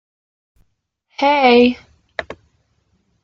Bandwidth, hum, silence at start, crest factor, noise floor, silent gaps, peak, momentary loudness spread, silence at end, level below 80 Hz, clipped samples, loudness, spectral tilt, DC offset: 6.8 kHz; none; 1.2 s; 18 dB; -68 dBFS; none; -2 dBFS; 24 LU; 0.9 s; -56 dBFS; under 0.1%; -13 LUFS; -5 dB/octave; under 0.1%